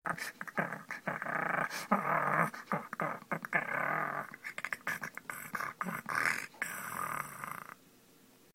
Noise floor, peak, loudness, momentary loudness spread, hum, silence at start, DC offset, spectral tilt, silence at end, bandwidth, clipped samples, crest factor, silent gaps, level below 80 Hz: -63 dBFS; -12 dBFS; -36 LUFS; 10 LU; none; 0.05 s; under 0.1%; -4 dB/octave; 0.8 s; 16.5 kHz; under 0.1%; 26 dB; none; -76 dBFS